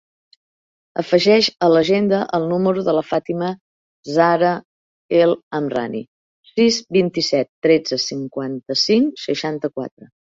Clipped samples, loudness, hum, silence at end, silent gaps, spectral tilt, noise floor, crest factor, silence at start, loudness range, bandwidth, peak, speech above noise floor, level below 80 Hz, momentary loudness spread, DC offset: under 0.1%; -18 LUFS; none; 0.3 s; 3.61-4.03 s, 4.65-5.09 s, 5.43-5.51 s, 6.08-6.43 s, 7.49-7.62 s, 9.91-9.97 s; -5 dB/octave; under -90 dBFS; 16 dB; 0.95 s; 2 LU; 7.8 kHz; -2 dBFS; over 72 dB; -60 dBFS; 13 LU; under 0.1%